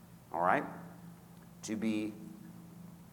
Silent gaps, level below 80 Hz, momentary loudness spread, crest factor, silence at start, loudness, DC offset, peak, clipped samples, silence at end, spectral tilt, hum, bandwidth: none; -72 dBFS; 22 LU; 24 dB; 0 s; -36 LUFS; under 0.1%; -14 dBFS; under 0.1%; 0 s; -5.5 dB/octave; none; 19 kHz